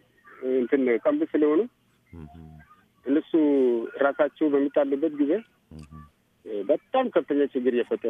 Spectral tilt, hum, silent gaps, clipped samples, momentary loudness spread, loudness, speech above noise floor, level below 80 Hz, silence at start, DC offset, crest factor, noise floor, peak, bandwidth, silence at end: -8 dB/octave; none; none; under 0.1%; 14 LU; -24 LUFS; 30 dB; -62 dBFS; 0.4 s; under 0.1%; 16 dB; -54 dBFS; -10 dBFS; 3.8 kHz; 0 s